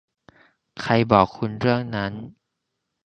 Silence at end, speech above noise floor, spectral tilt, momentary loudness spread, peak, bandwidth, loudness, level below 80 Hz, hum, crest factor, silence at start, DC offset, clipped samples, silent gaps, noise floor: 0.75 s; 58 dB; -7.5 dB/octave; 21 LU; 0 dBFS; 8.4 kHz; -22 LUFS; -52 dBFS; none; 24 dB; 0.75 s; under 0.1%; under 0.1%; none; -79 dBFS